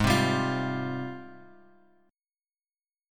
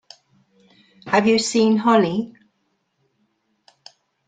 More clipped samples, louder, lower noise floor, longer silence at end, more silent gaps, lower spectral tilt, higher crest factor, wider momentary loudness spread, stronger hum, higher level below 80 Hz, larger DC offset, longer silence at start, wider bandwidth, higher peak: neither; second, -29 LUFS vs -18 LUFS; first, under -90 dBFS vs -70 dBFS; second, 1.65 s vs 2 s; neither; about the same, -5.5 dB/octave vs -4.5 dB/octave; about the same, 22 dB vs 18 dB; first, 19 LU vs 10 LU; neither; first, -48 dBFS vs -64 dBFS; neither; second, 0 s vs 1.05 s; first, 17.5 kHz vs 9.4 kHz; second, -8 dBFS vs -4 dBFS